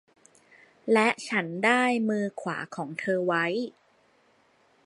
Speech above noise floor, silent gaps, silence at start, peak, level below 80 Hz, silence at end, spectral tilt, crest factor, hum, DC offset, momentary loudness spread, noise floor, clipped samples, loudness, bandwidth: 38 dB; none; 0.85 s; -6 dBFS; -80 dBFS; 1.15 s; -5 dB/octave; 22 dB; none; under 0.1%; 11 LU; -64 dBFS; under 0.1%; -26 LUFS; 11.5 kHz